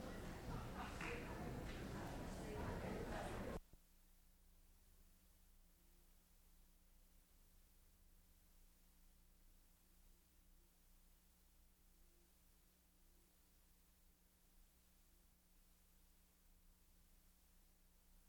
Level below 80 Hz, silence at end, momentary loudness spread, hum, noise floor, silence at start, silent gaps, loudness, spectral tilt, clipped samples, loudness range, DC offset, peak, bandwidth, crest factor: -62 dBFS; 0 s; 4 LU; none; -74 dBFS; 0 s; none; -51 LUFS; -5.5 dB/octave; under 0.1%; 8 LU; under 0.1%; -36 dBFS; over 20 kHz; 20 dB